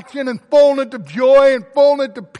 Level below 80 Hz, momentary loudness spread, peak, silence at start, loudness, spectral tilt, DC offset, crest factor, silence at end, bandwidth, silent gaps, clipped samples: -54 dBFS; 13 LU; -2 dBFS; 0.15 s; -13 LUFS; -5 dB/octave; under 0.1%; 10 dB; 0.15 s; 9.4 kHz; none; under 0.1%